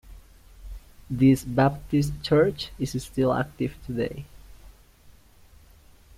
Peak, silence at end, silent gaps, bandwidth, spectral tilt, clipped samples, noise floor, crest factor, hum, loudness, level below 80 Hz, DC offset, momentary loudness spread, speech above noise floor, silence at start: -8 dBFS; 1.05 s; none; 16 kHz; -7 dB/octave; under 0.1%; -53 dBFS; 18 dB; none; -25 LUFS; -46 dBFS; under 0.1%; 22 LU; 29 dB; 0.05 s